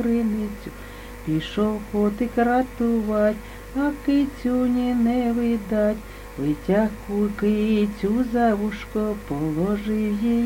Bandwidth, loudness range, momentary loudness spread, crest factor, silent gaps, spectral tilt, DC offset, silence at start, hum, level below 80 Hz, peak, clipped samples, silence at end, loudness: 17 kHz; 1 LU; 8 LU; 16 dB; none; -7.5 dB/octave; under 0.1%; 0 s; none; -40 dBFS; -8 dBFS; under 0.1%; 0 s; -23 LUFS